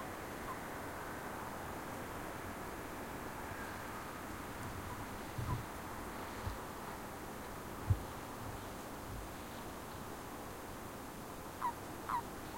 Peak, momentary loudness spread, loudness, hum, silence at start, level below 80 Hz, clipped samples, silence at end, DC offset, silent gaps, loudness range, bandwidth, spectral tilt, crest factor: -22 dBFS; 6 LU; -45 LUFS; none; 0 s; -56 dBFS; under 0.1%; 0 s; under 0.1%; none; 2 LU; 16.5 kHz; -5 dB/octave; 22 dB